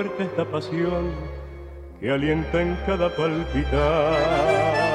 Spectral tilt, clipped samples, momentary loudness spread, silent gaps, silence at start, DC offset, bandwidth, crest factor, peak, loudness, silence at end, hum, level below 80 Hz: -7 dB/octave; under 0.1%; 15 LU; none; 0 s; under 0.1%; 11 kHz; 14 dB; -8 dBFS; -23 LUFS; 0 s; none; -34 dBFS